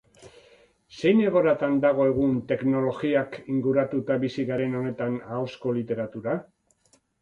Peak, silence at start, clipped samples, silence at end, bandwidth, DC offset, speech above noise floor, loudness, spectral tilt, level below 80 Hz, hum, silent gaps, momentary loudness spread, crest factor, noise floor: -8 dBFS; 0.2 s; under 0.1%; 0.8 s; 7.6 kHz; under 0.1%; 41 dB; -25 LUFS; -8 dB/octave; -60 dBFS; none; none; 9 LU; 16 dB; -65 dBFS